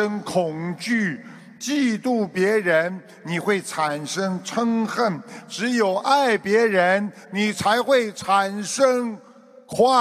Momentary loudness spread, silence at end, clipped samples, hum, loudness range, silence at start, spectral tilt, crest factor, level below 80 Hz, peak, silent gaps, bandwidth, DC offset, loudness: 10 LU; 0 s; under 0.1%; none; 3 LU; 0 s; -4.5 dB/octave; 18 dB; -66 dBFS; -4 dBFS; none; 15 kHz; under 0.1%; -22 LUFS